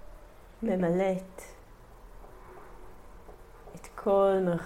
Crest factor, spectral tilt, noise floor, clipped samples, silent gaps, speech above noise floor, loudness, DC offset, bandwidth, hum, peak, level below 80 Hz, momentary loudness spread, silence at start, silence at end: 18 dB; -7.5 dB/octave; -51 dBFS; under 0.1%; none; 24 dB; -28 LUFS; under 0.1%; 16 kHz; none; -14 dBFS; -52 dBFS; 27 LU; 0.05 s; 0 s